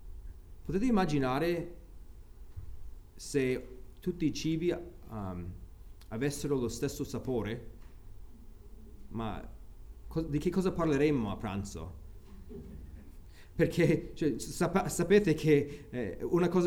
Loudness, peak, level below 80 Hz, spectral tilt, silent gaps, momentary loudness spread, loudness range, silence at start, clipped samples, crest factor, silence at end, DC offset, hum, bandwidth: -32 LUFS; -12 dBFS; -48 dBFS; -6.5 dB/octave; none; 23 LU; 8 LU; 0 s; under 0.1%; 20 dB; 0 s; under 0.1%; none; over 20 kHz